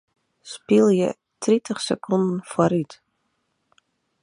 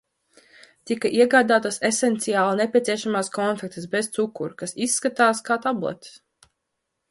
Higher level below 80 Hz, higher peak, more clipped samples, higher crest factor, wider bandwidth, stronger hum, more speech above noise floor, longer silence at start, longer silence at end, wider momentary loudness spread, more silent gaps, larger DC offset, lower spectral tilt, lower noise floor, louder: about the same, -66 dBFS vs -70 dBFS; about the same, -4 dBFS vs -4 dBFS; neither; about the same, 20 dB vs 18 dB; about the same, 11 kHz vs 11.5 kHz; neither; second, 52 dB vs 57 dB; second, 0.45 s vs 0.85 s; first, 1.3 s vs 1 s; about the same, 14 LU vs 12 LU; neither; neither; first, -6 dB/octave vs -3.5 dB/octave; second, -72 dBFS vs -79 dBFS; about the same, -22 LUFS vs -22 LUFS